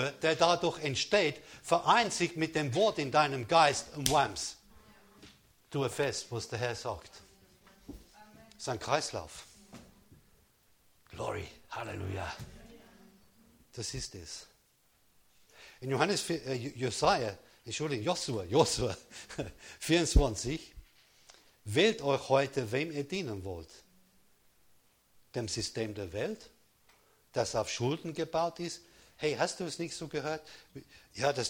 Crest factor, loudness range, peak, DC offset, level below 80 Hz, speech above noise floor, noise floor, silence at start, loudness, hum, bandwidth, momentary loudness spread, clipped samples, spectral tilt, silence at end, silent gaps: 28 dB; 14 LU; -6 dBFS; under 0.1%; -48 dBFS; 37 dB; -69 dBFS; 0 s; -32 LUFS; none; over 20 kHz; 19 LU; under 0.1%; -4 dB/octave; 0 s; none